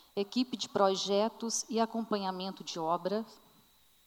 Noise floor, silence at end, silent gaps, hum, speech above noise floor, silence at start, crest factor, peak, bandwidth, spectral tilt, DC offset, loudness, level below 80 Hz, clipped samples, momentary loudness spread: -65 dBFS; 0.7 s; none; none; 32 dB; 0.15 s; 20 dB; -14 dBFS; 19.5 kHz; -3.5 dB/octave; under 0.1%; -33 LUFS; -80 dBFS; under 0.1%; 9 LU